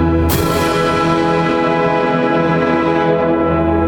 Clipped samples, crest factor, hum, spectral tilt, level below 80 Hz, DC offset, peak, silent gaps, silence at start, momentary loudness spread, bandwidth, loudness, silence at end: under 0.1%; 12 dB; none; -6 dB/octave; -30 dBFS; under 0.1%; -2 dBFS; none; 0 s; 0 LU; 18 kHz; -14 LUFS; 0 s